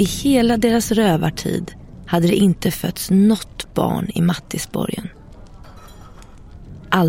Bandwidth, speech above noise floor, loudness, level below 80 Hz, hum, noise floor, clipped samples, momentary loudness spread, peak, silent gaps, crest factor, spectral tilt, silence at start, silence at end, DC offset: 16.5 kHz; 22 dB; -18 LUFS; -40 dBFS; none; -39 dBFS; under 0.1%; 11 LU; -2 dBFS; none; 18 dB; -5.5 dB/octave; 0 s; 0 s; under 0.1%